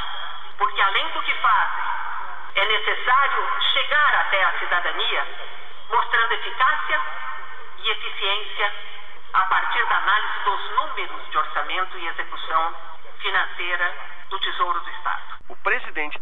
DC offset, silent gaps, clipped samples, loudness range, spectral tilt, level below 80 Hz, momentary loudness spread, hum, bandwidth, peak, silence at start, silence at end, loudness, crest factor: 6%; none; under 0.1%; 5 LU; -3.5 dB/octave; -60 dBFS; 14 LU; none; 7.6 kHz; -6 dBFS; 0 s; 0 s; -22 LUFS; 16 dB